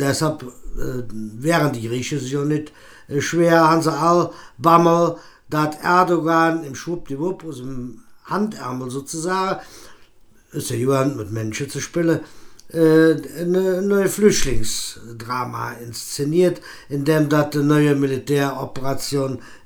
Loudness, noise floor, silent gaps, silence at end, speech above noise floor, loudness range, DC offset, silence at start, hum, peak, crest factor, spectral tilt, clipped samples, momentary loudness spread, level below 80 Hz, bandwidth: -20 LUFS; -49 dBFS; none; 0.1 s; 29 dB; 7 LU; under 0.1%; 0 s; none; 0 dBFS; 20 dB; -5.5 dB/octave; under 0.1%; 14 LU; -40 dBFS; 19.5 kHz